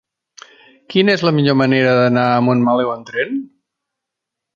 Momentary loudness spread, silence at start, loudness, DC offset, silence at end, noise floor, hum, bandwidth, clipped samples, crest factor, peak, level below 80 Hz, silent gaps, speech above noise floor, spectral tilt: 8 LU; 0.9 s; -15 LUFS; under 0.1%; 1.1 s; -81 dBFS; none; 7.2 kHz; under 0.1%; 16 dB; -2 dBFS; -60 dBFS; none; 67 dB; -7 dB/octave